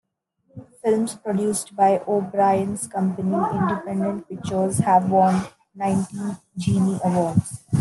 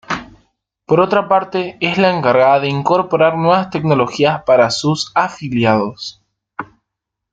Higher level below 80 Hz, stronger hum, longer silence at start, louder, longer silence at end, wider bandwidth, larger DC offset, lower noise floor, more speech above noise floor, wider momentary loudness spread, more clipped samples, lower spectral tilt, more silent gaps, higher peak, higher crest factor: about the same, -56 dBFS vs -54 dBFS; neither; first, 0.55 s vs 0.1 s; second, -22 LUFS vs -15 LUFS; second, 0 s vs 0.7 s; first, 12.5 kHz vs 9.2 kHz; neither; second, -67 dBFS vs -79 dBFS; second, 45 dB vs 65 dB; second, 9 LU vs 12 LU; neither; about the same, -6.5 dB/octave vs -5.5 dB/octave; neither; second, -4 dBFS vs 0 dBFS; about the same, 18 dB vs 14 dB